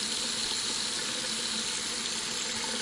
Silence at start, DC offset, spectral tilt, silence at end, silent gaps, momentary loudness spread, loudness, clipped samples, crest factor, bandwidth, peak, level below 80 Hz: 0 s; under 0.1%; 0 dB/octave; 0 s; none; 2 LU; -29 LUFS; under 0.1%; 16 dB; 11.5 kHz; -16 dBFS; -62 dBFS